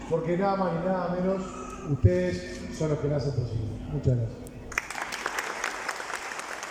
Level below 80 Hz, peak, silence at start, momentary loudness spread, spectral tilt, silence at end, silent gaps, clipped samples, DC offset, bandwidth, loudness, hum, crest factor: -46 dBFS; -6 dBFS; 0 s; 9 LU; -6 dB/octave; 0 s; none; under 0.1%; under 0.1%; 16 kHz; -29 LUFS; none; 22 dB